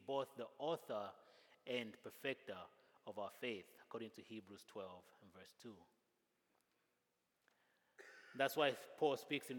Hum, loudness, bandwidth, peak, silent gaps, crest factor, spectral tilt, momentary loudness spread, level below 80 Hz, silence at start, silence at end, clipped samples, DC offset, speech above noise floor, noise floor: none; -46 LUFS; 18 kHz; -24 dBFS; none; 24 dB; -4 dB/octave; 22 LU; under -90 dBFS; 0 s; 0 s; under 0.1%; under 0.1%; 40 dB; -86 dBFS